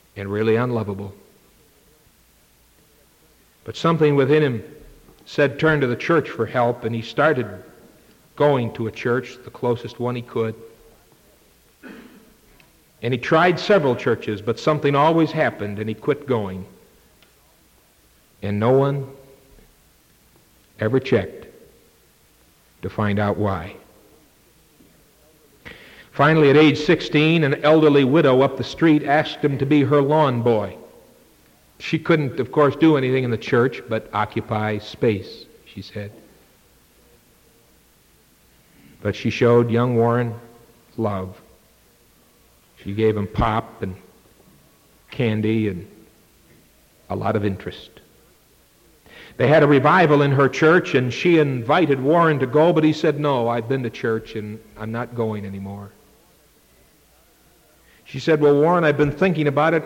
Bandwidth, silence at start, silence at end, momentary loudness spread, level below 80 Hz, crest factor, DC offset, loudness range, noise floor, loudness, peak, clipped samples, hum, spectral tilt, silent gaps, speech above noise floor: 16.5 kHz; 0.15 s; 0 s; 18 LU; -50 dBFS; 16 dB; under 0.1%; 12 LU; -56 dBFS; -19 LUFS; -6 dBFS; under 0.1%; none; -7.5 dB/octave; none; 37 dB